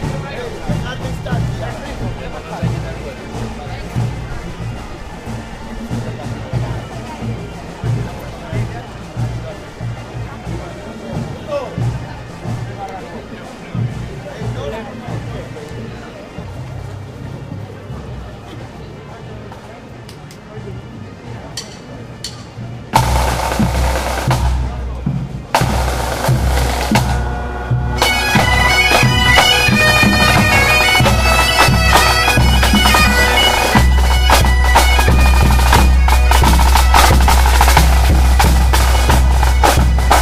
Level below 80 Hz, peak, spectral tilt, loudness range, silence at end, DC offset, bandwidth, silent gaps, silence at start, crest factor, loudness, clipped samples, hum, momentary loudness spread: -18 dBFS; 0 dBFS; -4 dB/octave; 19 LU; 0 s; under 0.1%; 16 kHz; none; 0 s; 14 dB; -13 LUFS; under 0.1%; none; 20 LU